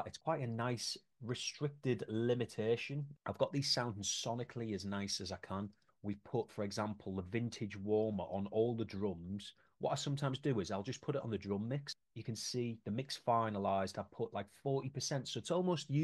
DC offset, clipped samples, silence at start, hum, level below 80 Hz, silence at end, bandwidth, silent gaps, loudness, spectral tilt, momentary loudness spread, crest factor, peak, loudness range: under 0.1%; under 0.1%; 0 s; none; -74 dBFS; 0 s; 12 kHz; none; -40 LUFS; -5 dB/octave; 9 LU; 20 dB; -18 dBFS; 3 LU